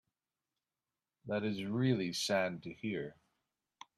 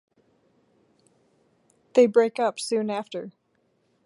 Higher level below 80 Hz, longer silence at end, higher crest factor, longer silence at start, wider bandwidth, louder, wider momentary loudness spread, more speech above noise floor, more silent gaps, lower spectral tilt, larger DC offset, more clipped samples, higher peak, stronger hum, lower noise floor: first, -76 dBFS vs -82 dBFS; about the same, 0.85 s vs 0.75 s; about the same, 20 dB vs 22 dB; second, 1.25 s vs 1.95 s; first, 13 kHz vs 11.5 kHz; second, -36 LUFS vs -24 LUFS; second, 10 LU vs 17 LU; first, over 54 dB vs 47 dB; neither; about the same, -5 dB/octave vs -4.5 dB/octave; neither; neither; second, -20 dBFS vs -6 dBFS; neither; first, under -90 dBFS vs -69 dBFS